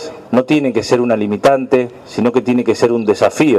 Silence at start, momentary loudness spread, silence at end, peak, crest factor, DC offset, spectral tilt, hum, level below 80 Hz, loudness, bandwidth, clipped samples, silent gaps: 0 s; 4 LU; 0 s; 0 dBFS; 14 dB; under 0.1%; -6 dB/octave; none; -54 dBFS; -14 LUFS; 13 kHz; under 0.1%; none